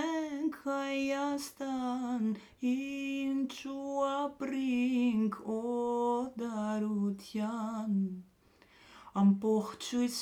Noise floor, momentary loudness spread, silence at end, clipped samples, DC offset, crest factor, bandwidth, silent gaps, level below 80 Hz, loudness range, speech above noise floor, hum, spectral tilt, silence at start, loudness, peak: -64 dBFS; 7 LU; 0 s; under 0.1%; under 0.1%; 16 dB; 16 kHz; none; -72 dBFS; 2 LU; 31 dB; none; -6 dB/octave; 0 s; -34 LUFS; -18 dBFS